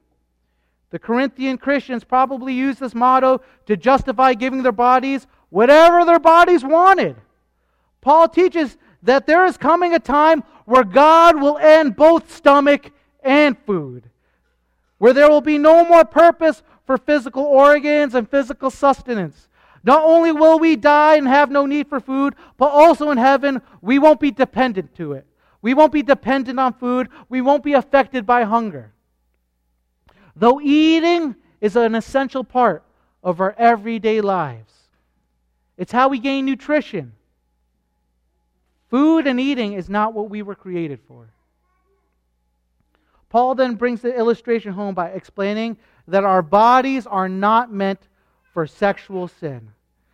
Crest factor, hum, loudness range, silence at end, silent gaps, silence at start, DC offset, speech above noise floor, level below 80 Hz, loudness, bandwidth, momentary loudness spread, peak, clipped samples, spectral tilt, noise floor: 16 dB; none; 9 LU; 0.55 s; none; 0.95 s; under 0.1%; 53 dB; -52 dBFS; -15 LUFS; 12 kHz; 15 LU; 0 dBFS; under 0.1%; -6 dB/octave; -68 dBFS